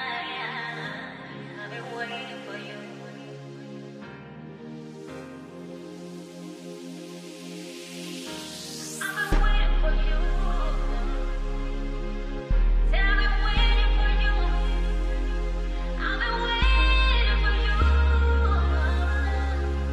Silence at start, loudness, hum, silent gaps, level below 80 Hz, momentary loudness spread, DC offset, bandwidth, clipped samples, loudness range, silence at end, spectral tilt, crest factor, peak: 0 s; -27 LUFS; none; none; -26 dBFS; 18 LU; under 0.1%; 12 kHz; under 0.1%; 17 LU; 0 s; -5 dB/octave; 14 dB; -10 dBFS